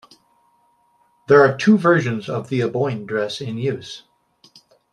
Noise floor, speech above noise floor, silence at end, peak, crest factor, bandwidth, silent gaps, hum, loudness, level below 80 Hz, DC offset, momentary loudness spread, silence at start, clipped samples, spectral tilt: -61 dBFS; 43 dB; 0.95 s; -2 dBFS; 18 dB; 10.5 kHz; none; none; -18 LUFS; -64 dBFS; under 0.1%; 13 LU; 1.3 s; under 0.1%; -6.5 dB/octave